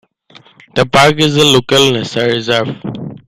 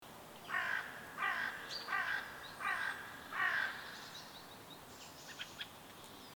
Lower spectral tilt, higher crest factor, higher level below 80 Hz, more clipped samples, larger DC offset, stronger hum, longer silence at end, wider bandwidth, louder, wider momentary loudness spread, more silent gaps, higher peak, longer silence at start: first, -4 dB/octave vs -1.5 dB/octave; second, 12 dB vs 18 dB; first, -44 dBFS vs -76 dBFS; neither; neither; neither; about the same, 0.1 s vs 0 s; second, 16 kHz vs over 20 kHz; first, -11 LUFS vs -40 LUFS; second, 12 LU vs 15 LU; neither; first, 0 dBFS vs -24 dBFS; first, 0.75 s vs 0 s